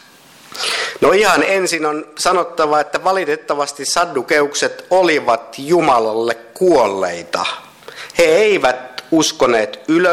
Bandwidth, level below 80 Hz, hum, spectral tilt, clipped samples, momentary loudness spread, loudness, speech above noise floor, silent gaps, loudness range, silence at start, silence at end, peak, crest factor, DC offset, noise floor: 15.5 kHz; -54 dBFS; none; -3 dB/octave; under 0.1%; 9 LU; -15 LUFS; 29 dB; none; 1 LU; 0.5 s; 0 s; -4 dBFS; 12 dB; under 0.1%; -43 dBFS